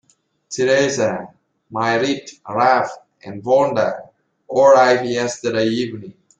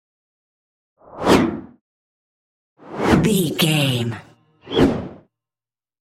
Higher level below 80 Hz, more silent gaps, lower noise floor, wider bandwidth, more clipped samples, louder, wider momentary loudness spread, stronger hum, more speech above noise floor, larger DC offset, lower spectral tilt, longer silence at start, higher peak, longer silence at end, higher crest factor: second, -62 dBFS vs -44 dBFS; second, none vs 1.81-2.76 s; second, -55 dBFS vs under -90 dBFS; second, 9 kHz vs 16 kHz; neither; about the same, -17 LUFS vs -19 LUFS; about the same, 17 LU vs 18 LU; neither; second, 38 dB vs over 71 dB; neither; about the same, -4.5 dB/octave vs -5.5 dB/octave; second, 0.5 s vs 1.1 s; about the same, -2 dBFS vs -2 dBFS; second, 0.3 s vs 1 s; about the same, 16 dB vs 20 dB